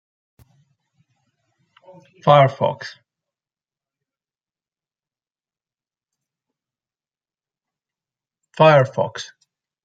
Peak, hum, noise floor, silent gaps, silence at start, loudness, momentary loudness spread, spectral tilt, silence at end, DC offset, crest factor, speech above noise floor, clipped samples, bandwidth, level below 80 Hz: 0 dBFS; none; under -90 dBFS; none; 2.25 s; -16 LUFS; 21 LU; -6.5 dB/octave; 0.6 s; under 0.1%; 24 dB; over 74 dB; under 0.1%; 7.8 kHz; -68 dBFS